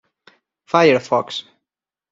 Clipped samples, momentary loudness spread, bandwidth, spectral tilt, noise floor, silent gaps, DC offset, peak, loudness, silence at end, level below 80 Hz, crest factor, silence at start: under 0.1%; 14 LU; 7.8 kHz; -5 dB/octave; -85 dBFS; none; under 0.1%; -2 dBFS; -17 LUFS; 0.7 s; -66 dBFS; 20 dB; 0.75 s